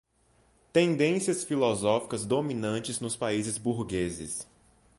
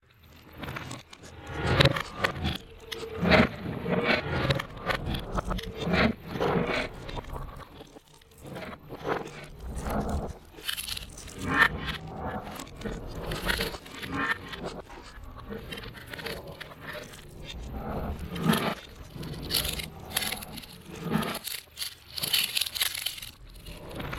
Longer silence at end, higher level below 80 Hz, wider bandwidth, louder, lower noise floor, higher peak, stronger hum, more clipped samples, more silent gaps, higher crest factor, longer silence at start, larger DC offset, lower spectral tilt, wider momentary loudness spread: first, 0.55 s vs 0 s; second, -58 dBFS vs -44 dBFS; second, 11.5 kHz vs 16.5 kHz; about the same, -29 LUFS vs -30 LUFS; first, -66 dBFS vs -54 dBFS; second, -10 dBFS vs -6 dBFS; neither; neither; neither; second, 18 dB vs 26 dB; first, 0.75 s vs 0.25 s; neither; about the same, -4.5 dB/octave vs -4 dB/octave; second, 7 LU vs 19 LU